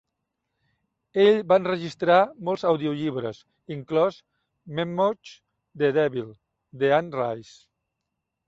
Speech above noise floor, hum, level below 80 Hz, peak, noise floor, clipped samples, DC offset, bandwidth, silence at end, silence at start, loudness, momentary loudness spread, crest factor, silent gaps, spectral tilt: 58 dB; none; -68 dBFS; -6 dBFS; -82 dBFS; under 0.1%; under 0.1%; 7.8 kHz; 1.05 s; 1.15 s; -24 LUFS; 16 LU; 20 dB; none; -7 dB/octave